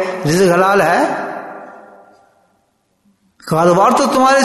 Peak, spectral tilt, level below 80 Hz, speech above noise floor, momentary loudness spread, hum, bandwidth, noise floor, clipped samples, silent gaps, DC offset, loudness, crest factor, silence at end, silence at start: 0 dBFS; -5 dB/octave; -54 dBFS; 50 dB; 19 LU; none; 12.5 kHz; -62 dBFS; under 0.1%; none; under 0.1%; -13 LUFS; 14 dB; 0 s; 0 s